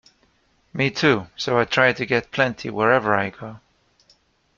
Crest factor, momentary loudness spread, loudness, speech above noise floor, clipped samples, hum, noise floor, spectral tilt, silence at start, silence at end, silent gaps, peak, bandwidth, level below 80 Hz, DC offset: 20 dB; 11 LU; -20 LUFS; 42 dB; under 0.1%; none; -63 dBFS; -5.5 dB/octave; 0.75 s; 1 s; none; -2 dBFS; 7.4 kHz; -58 dBFS; under 0.1%